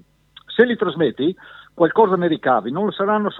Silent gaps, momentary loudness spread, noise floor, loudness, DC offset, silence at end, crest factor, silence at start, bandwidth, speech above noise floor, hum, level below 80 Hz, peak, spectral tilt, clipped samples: none; 8 LU; -49 dBFS; -19 LUFS; under 0.1%; 0 s; 20 dB; 0.5 s; 4.1 kHz; 31 dB; none; -62 dBFS; 0 dBFS; -9 dB/octave; under 0.1%